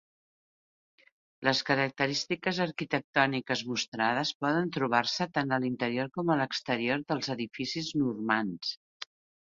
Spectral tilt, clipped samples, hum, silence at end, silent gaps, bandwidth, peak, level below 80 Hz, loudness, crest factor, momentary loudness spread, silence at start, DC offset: -4.5 dB/octave; under 0.1%; none; 0.4 s; 3.04-3.13 s, 3.88-3.92 s, 4.35-4.40 s, 8.77-9.00 s; 7.6 kHz; -8 dBFS; -70 dBFS; -30 LUFS; 24 dB; 7 LU; 1.4 s; under 0.1%